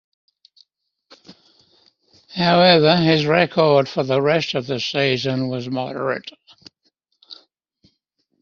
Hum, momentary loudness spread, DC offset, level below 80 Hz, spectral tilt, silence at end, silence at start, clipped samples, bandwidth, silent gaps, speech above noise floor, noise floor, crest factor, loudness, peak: none; 12 LU; under 0.1%; -60 dBFS; -3.5 dB/octave; 1.05 s; 1.3 s; under 0.1%; 7 kHz; none; 53 dB; -71 dBFS; 20 dB; -18 LUFS; -2 dBFS